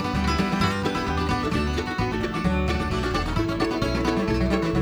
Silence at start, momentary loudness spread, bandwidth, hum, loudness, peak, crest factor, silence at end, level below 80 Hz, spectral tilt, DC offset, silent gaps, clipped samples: 0 s; 3 LU; 20 kHz; none; -24 LUFS; -10 dBFS; 14 dB; 0 s; -32 dBFS; -6 dB/octave; under 0.1%; none; under 0.1%